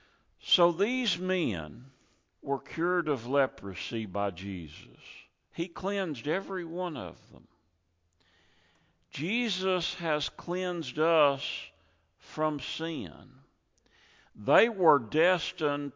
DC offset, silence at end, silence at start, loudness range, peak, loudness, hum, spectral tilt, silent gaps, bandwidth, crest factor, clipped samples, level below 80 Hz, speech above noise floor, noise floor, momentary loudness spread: under 0.1%; 0.05 s; 0.45 s; 7 LU; -8 dBFS; -30 LUFS; none; -5 dB/octave; none; 7.6 kHz; 22 dB; under 0.1%; -62 dBFS; 44 dB; -74 dBFS; 19 LU